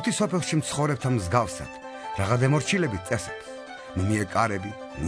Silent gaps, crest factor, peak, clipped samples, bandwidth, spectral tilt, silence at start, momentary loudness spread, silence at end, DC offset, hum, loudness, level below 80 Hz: none; 18 dB; -8 dBFS; under 0.1%; 11 kHz; -5.5 dB/octave; 0 s; 14 LU; 0 s; under 0.1%; none; -26 LUFS; -50 dBFS